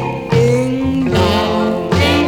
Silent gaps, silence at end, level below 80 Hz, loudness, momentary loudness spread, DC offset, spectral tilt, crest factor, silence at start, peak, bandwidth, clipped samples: none; 0 s; -32 dBFS; -14 LUFS; 3 LU; 0.2%; -6 dB/octave; 12 dB; 0 s; -2 dBFS; 18.5 kHz; under 0.1%